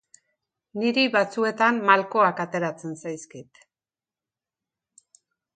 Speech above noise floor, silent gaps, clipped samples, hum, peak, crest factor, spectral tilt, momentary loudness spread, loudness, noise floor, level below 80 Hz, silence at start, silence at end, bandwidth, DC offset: over 67 dB; none; under 0.1%; none; -2 dBFS; 24 dB; -4.5 dB/octave; 17 LU; -23 LUFS; under -90 dBFS; -78 dBFS; 0.75 s; 2.15 s; 9.4 kHz; under 0.1%